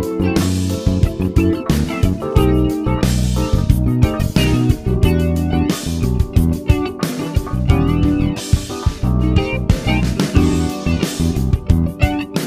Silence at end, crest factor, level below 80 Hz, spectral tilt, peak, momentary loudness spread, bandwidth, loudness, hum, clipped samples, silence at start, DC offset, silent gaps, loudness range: 0 s; 16 dB; -22 dBFS; -6.5 dB/octave; 0 dBFS; 4 LU; 16 kHz; -17 LUFS; none; under 0.1%; 0 s; 0.7%; none; 1 LU